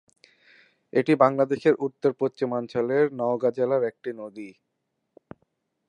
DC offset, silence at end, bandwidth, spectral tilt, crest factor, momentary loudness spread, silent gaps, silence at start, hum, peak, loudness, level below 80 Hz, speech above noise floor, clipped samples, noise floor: under 0.1%; 1.4 s; 10 kHz; -8 dB/octave; 22 dB; 16 LU; none; 0.95 s; none; -4 dBFS; -24 LUFS; -74 dBFS; 55 dB; under 0.1%; -78 dBFS